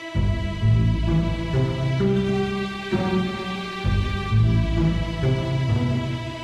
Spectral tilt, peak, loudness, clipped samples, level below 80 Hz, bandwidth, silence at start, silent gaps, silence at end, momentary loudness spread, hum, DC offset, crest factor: -7.5 dB/octave; -8 dBFS; -23 LUFS; under 0.1%; -30 dBFS; 9.6 kHz; 0 s; none; 0 s; 6 LU; none; under 0.1%; 12 dB